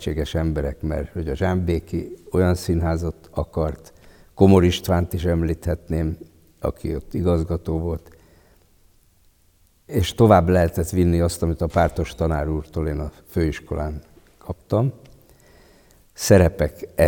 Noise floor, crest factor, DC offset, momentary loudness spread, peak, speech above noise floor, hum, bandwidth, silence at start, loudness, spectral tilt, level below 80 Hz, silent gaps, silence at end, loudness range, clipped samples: -58 dBFS; 20 dB; under 0.1%; 14 LU; -2 dBFS; 38 dB; none; 17.5 kHz; 0 s; -22 LUFS; -6.5 dB/octave; -36 dBFS; none; 0 s; 8 LU; under 0.1%